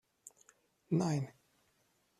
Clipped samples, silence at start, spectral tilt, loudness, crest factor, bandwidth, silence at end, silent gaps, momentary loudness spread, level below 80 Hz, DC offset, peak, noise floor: under 0.1%; 0.9 s; -7 dB/octave; -36 LUFS; 18 dB; 13 kHz; 0.9 s; none; 24 LU; -78 dBFS; under 0.1%; -22 dBFS; -76 dBFS